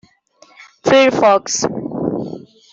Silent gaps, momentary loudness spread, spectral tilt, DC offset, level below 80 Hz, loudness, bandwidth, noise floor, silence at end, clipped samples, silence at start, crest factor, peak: none; 15 LU; -3.5 dB/octave; under 0.1%; -56 dBFS; -15 LUFS; 8 kHz; -50 dBFS; 0.35 s; under 0.1%; 0.6 s; 14 dB; -2 dBFS